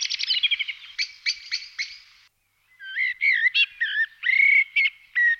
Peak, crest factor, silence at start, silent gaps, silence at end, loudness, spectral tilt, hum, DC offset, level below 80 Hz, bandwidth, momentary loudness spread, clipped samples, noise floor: -10 dBFS; 14 dB; 0 s; none; 0 s; -21 LUFS; 6 dB/octave; none; under 0.1%; -74 dBFS; 7.6 kHz; 14 LU; under 0.1%; -64 dBFS